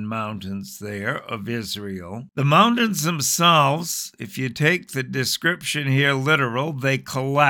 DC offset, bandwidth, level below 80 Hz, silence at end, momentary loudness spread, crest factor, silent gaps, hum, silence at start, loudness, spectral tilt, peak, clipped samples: under 0.1%; 19 kHz; -64 dBFS; 0 s; 15 LU; 20 dB; none; none; 0 s; -21 LUFS; -4 dB/octave; -2 dBFS; under 0.1%